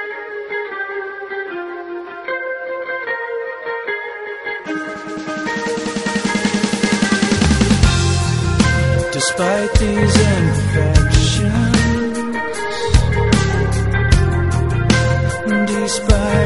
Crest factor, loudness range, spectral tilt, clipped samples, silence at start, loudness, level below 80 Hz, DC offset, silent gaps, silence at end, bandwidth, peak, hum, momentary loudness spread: 16 dB; 9 LU; -5 dB/octave; under 0.1%; 0 s; -17 LUFS; -24 dBFS; under 0.1%; none; 0 s; 11.5 kHz; 0 dBFS; none; 11 LU